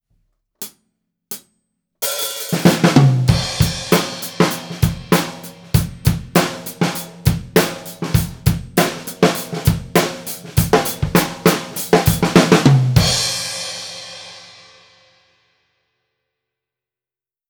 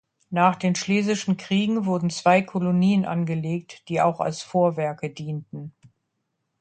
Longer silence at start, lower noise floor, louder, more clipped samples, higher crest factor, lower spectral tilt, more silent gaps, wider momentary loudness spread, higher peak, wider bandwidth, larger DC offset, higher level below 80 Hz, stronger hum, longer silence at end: first, 0.6 s vs 0.3 s; first, under -90 dBFS vs -77 dBFS; first, -17 LUFS vs -23 LUFS; neither; about the same, 18 dB vs 20 dB; about the same, -5 dB/octave vs -6 dB/octave; neither; first, 18 LU vs 12 LU; first, 0 dBFS vs -4 dBFS; first, over 20 kHz vs 9 kHz; neither; first, -34 dBFS vs -66 dBFS; neither; first, 3.05 s vs 0.9 s